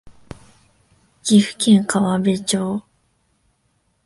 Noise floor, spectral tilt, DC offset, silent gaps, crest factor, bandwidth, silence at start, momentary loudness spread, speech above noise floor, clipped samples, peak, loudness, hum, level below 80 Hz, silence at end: -65 dBFS; -5 dB/octave; under 0.1%; none; 18 dB; 11.5 kHz; 0.05 s; 11 LU; 49 dB; under 0.1%; -2 dBFS; -18 LUFS; none; -56 dBFS; 1.25 s